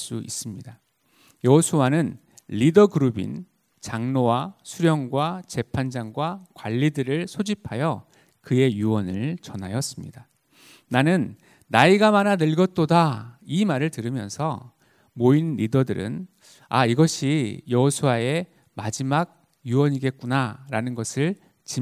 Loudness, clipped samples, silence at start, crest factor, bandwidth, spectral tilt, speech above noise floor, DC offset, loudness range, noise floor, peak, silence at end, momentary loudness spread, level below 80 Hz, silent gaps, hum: -23 LUFS; under 0.1%; 0 s; 22 dB; 15.5 kHz; -6 dB/octave; 38 dB; under 0.1%; 5 LU; -60 dBFS; 0 dBFS; 0 s; 15 LU; -56 dBFS; none; none